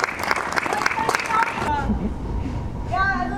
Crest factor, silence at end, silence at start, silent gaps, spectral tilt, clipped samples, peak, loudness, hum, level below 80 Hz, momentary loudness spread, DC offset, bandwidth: 22 dB; 0 s; 0 s; none; -4.5 dB/octave; under 0.1%; 0 dBFS; -23 LUFS; none; -32 dBFS; 8 LU; under 0.1%; 18.5 kHz